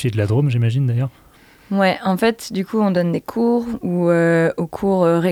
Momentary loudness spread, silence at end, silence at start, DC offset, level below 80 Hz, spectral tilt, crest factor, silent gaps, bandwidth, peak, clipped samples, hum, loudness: 7 LU; 0 s; 0 s; under 0.1%; -52 dBFS; -7.5 dB/octave; 12 dB; none; 16 kHz; -6 dBFS; under 0.1%; none; -18 LUFS